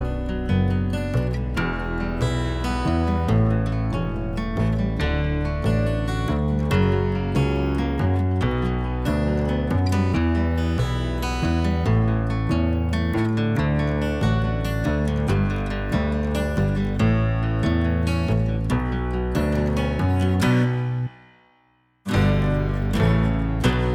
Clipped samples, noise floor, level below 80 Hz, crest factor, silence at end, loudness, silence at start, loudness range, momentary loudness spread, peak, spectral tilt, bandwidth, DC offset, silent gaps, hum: under 0.1%; -62 dBFS; -28 dBFS; 14 dB; 0 s; -23 LUFS; 0 s; 1 LU; 5 LU; -6 dBFS; -7.5 dB/octave; 14.5 kHz; under 0.1%; none; none